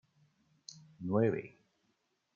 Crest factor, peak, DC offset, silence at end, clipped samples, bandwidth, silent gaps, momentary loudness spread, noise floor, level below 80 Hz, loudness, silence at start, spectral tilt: 22 dB; -18 dBFS; under 0.1%; 0.85 s; under 0.1%; 7.4 kHz; none; 23 LU; -79 dBFS; -76 dBFS; -34 LUFS; 0.7 s; -7.5 dB/octave